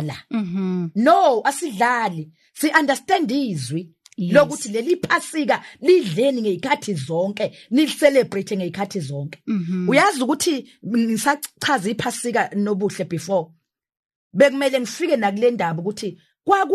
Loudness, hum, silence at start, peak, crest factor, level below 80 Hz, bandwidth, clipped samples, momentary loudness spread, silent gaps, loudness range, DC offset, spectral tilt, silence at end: -20 LUFS; none; 0 s; -2 dBFS; 18 dB; -64 dBFS; 13 kHz; under 0.1%; 11 LU; 13.99-14.09 s, 14.16-14.31 s; 3 LU; under 0.1%; -5 dB/octave; 0 s